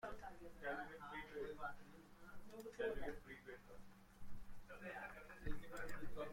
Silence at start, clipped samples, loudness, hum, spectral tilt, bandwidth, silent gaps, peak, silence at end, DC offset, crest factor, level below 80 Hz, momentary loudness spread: 0 s; under 0.1%; -52 LUFS; none; -5.5 dB/octave; 16.5 kHz; none; -30 dBFS; 0 s; under 0.1%; 18 dB; -60 dBFS; 16 LU